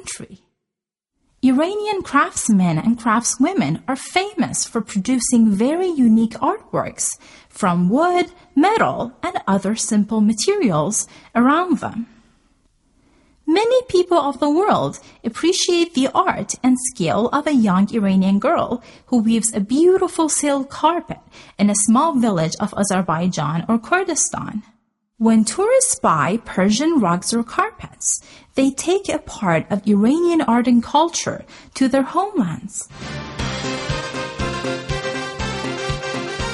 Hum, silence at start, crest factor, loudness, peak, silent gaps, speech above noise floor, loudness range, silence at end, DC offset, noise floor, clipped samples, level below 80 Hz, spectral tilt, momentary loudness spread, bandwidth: none; 0.05 s; 16 dB; -18 LUFS; -2 dBFS; none; 67 dB; 3 LU; 0 s; under 0.1%; -85 dBFS; under 0.1%; -46 dBFS; -4.5 dB/octave; 10 LU; 11.5 kHz